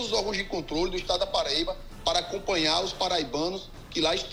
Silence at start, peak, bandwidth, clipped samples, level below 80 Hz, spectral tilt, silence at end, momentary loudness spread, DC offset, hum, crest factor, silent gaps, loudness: 0 s; -10 dBFS; 16 kHz; under 0.1%; -44 dBFS; -3 dB/octave; 0 s; 7 LU; under 0.1%; none; 18 dB; none; -27 LUFS